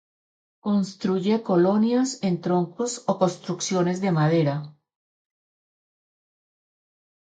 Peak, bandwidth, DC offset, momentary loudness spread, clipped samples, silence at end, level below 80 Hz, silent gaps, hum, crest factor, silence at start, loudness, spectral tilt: -8 dBFS; 9.4 kHz; under 0.1%; 7 LU; under 0.1%; 2.55 s; -70 dBFS; none; none; 18 dB; 0.65 s; -24 LUFS; -6 dB/octave